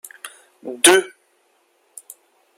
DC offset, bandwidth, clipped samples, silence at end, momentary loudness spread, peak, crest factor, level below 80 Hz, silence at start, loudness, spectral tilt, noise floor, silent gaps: under 0.1%; 16.5 kHz; under 0.1%; 1.5 s; 27 LU; 0 dBFS; 22 dB; -68 dBFS; 0.25 s; -14 LUFS; -0.5 dB/octave; -62 dBFS; none